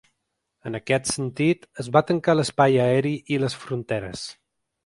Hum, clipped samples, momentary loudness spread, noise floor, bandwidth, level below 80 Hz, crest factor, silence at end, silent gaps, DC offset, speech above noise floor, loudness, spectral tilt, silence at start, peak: none; under 0.1%; 15 LU; -78 dBFS; 11.5 kHz; -58 dBFS; 22 dB; 0.55 s; none; under 0.1%; 56 dB; -23 LUFS; -5.5 dB/octave; 0.65 s; -2 dBFS